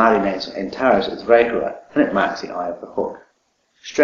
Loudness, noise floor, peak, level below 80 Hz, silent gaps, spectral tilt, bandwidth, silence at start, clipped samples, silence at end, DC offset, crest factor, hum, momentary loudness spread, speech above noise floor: -20 LUFS; -65 dBFS; 0 dBFS; -52 dBFS; none; -5.5 dB/octave; 7.2 kHz; 0 s; under 0.1%; 0 s; under 0.1%; 18 dB; none; 12 LU; 46 dB